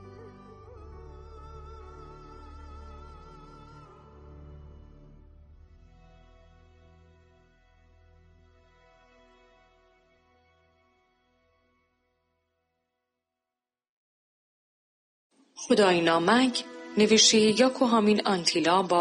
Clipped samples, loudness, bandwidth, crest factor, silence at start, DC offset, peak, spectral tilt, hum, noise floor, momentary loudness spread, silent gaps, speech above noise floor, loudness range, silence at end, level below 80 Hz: under 0.1%; -22 LUFS; 10 kHz; 24 dB; 0.05 s; under 0.1%; -6 dBFS; -3 dB/octave; none; under -90 dBFS; 29 LU; 13.89-15.30 s; over 68 dB; 27 LU; 0 s; -54 dBFS